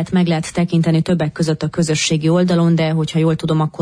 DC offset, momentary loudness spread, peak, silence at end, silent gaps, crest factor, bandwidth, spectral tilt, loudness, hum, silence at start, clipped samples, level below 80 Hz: under 0.1%; 4 LU; -6 dBFS; 0 s; none; 10 dB; 10.5 kHz; -6 dB/octave; -16 LUFS; none; 0 s; under 0.1%; -48 dBFS